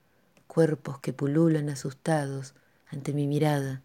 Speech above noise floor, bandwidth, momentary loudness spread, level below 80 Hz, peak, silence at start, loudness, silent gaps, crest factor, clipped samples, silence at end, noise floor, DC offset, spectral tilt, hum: 37 dB; 15.5 kHz; 13 LU; -70 dBFS; -10 dBFS; 0.55 s; -28 LUFS; none; 18 dB; under 0.1%; 0.05 s; -65 dBFS; under 0.1%; -7 dB/octave; none